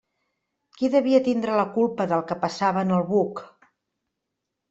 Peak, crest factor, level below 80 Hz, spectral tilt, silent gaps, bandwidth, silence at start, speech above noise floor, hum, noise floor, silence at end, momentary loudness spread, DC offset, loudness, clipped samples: -6 dBFS; 18 dB; -68 dBFS; -7 dB/octave; none; 8 kHz; 0.8 s; 60 dB; none; -82 dBFS; 1.25 s; 8 LU; under 0.1%; -23 LUFS; under 0.1%